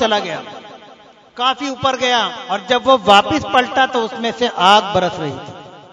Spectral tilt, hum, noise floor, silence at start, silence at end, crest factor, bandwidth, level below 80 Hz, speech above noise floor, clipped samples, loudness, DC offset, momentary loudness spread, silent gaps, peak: -3.5 dB/octave; none; -44 dBFS; 0 s; 0.1 s; 16 dB; 12 kHz; -54 dBFS; 28 dB; 0.1%; -15 LUFS; under 0.1%; 15 LU; none; 0 dBFS